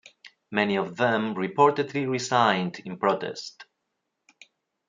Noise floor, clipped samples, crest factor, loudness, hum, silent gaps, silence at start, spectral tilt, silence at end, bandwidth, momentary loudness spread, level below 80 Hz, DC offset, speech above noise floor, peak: -80 dBFS; under 0.1%; 20 dB; -25 LUFS; none; none; 0.25 s; -5 dB/octave; 1.25 s; 9.4 kHz; 11 LU; -74 dBFS; under 0.1%; 55 dB; -6 dBFS